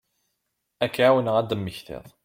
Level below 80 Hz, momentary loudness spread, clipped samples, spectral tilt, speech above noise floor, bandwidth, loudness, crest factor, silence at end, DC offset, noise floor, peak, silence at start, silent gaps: -58 dBFS; 17 LU; under 0.1%; -6 dB/octave; 55 dB; 16.5 kHz; -23 LUFS; 18 dB; 0.15 s; under 0.1%; -78 dBFS; -6 dBFS; 0.8 s; none